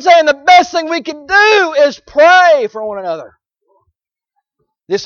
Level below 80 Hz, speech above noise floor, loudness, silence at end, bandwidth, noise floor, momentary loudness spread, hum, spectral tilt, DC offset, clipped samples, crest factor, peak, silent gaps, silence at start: -54 dBFS; 61 dB; -10 LUFS; 0 s; 7.2 kHz; -71 dBFS; 14 LU; none; -2 dB/octave; under 0.1%; under 0.1%; 12 dB; 0 dBFS; none; 0 s